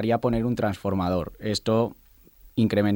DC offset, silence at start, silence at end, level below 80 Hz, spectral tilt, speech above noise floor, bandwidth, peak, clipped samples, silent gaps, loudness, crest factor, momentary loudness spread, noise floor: under 0.1%; 0 s; 0 s; -48 dBFS; -6.5 dB/octave; 29 dB; 17 kHz; -10 dBFS; under 0.1%; none; -26 LUFS; 16 dB; 5 LU; -53 dBFS